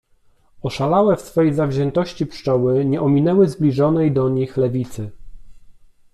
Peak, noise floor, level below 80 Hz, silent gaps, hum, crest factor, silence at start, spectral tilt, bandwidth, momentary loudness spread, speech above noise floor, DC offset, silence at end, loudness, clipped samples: -4 dBFS; -55 dBFS; -46 dBFS; none; none; 14 dB; 0.6 s; -8.5 dB/octave; 13 kHz; 10 LU; 38 dB; under 0.1%; 0.45 s; -18 LUFS; under 0.1%